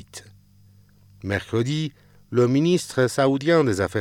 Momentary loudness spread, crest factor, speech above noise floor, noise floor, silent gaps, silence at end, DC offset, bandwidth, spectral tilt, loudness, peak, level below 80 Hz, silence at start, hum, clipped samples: 14 LU; 16 dB; 32 dB; -53 dBFS; none; 0 s; under 0.1%; 16.5 kHz; -6 dB/octave; -22 LUFS; -6 dBFS; -60 dBFS; 0.15 s; 50 Hz at -50 dBFS; under 0.1%